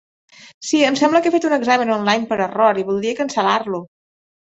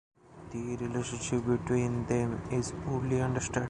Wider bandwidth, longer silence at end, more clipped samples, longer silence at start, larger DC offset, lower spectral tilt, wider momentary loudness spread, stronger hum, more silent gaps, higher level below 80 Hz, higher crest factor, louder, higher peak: second, 8.2 kHz vs 10.5 kHz; first, 0.55 s vs 0 s; neither; about the same, 0.4 s vs 0.3 s; neither; second, -4 dB/octave vs -6 dB/octave; about the same, 6 LU vs 8 LU; neither; first, 0.54-0.61 s vs none; second, -62 dBFS vs -50 dBFS; about the same, 16 dB vs 16 dB; first, -17 LUFS vs -32 LUFS; first, -2 dBFS vs -16 dBFS